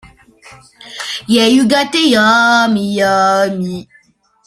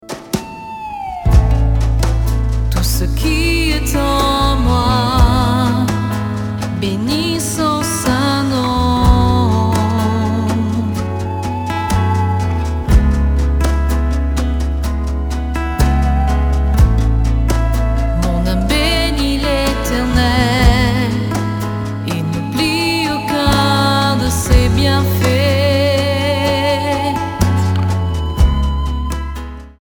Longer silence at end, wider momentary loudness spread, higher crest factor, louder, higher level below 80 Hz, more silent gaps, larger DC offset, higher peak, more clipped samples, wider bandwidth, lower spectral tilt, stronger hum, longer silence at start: first, 0.65 s vs 0.1 s; first, 14 LU vs 8 LU; about the same, 14 dB vs 14 dB; first, -12 LUFS vs -15 LUFS; second, -52 dBFS vs -18 dBFS; neither; neither; about the same, 0 dBFS vs 0 dBFS; neither; second, 15 kHz vs over 20 kHz; second, -4 dB/octave vs -5.5 dB/octave; neither; first, 0.85 s vs 0.05 s